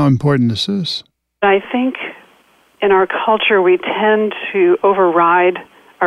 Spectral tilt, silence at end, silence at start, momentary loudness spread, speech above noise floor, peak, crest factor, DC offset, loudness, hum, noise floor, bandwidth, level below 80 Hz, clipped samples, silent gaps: -6.5 dB/octave; 0 s; 0 s; 9 LU; 39 dB; -2 dBFS; 12 dB; under 0.1%; -14 LUFS; none; -52 dBFS; 11 kHz; -56 dBFS; under 0.1%; none